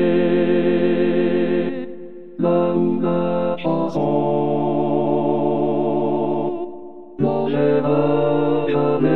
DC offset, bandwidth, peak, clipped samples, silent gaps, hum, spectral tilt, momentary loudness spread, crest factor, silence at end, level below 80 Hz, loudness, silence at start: 3%; 4.4 kHz; -6 dBFS; under 0.1%; none; none; -10 dB/octave; 9 LU; 12 dB; 0 s; -64 dBFS; -19 LUFS; 0 s